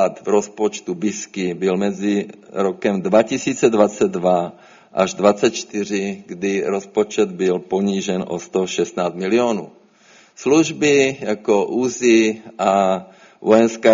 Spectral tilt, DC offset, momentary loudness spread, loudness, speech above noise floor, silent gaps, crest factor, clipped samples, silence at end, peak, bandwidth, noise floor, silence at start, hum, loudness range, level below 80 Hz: -4.5 dB/octave; under 0.1%; 9 LU; -19 LUFS; 32 dB; none; 18 dB; under 0.1%; 0 s; 0 dBFS; 7.6 kHz; -50 dBFS; 0 s; none; 4 LU; -62 dBFS